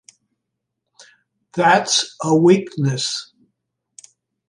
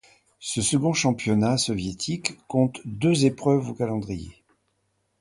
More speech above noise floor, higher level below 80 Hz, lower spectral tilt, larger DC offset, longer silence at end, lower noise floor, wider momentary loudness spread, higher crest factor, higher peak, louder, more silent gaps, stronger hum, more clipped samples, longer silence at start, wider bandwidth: first, 62 dB vs 48 dB; second, -68 dBFS vs -52 dBFS; about the same, -4 dB/octave vs -5 dB/octave; neither; first, 1.25 s vs 0.9 s; first, -79 dBFS vs -72 dBFS; about the same, 10 LU vs 9 LU; about the same, 18 dB vs 20 dB; about the same, -2 dBFS vs -4 dBFS; first, -17 LUFS vs -24 LUFS; neither; neither; neither; first, 1.55 s vs 0.4 s; about the same, 11.5 kHz vs 11.5 kHz